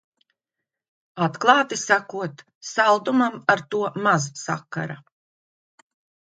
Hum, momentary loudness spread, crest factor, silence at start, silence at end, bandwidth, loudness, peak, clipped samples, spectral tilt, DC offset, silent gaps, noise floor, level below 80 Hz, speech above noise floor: none; 15 LU; 24 dB; 1.15 s; 1.35 s; 9.4 kHz; -22 LUFS; 0 dBFS; under 0.1%; -4 dB/octave; under 0.1%; 2.55-2.61 s; -85 dBFS; -72 dBFS; 63 dB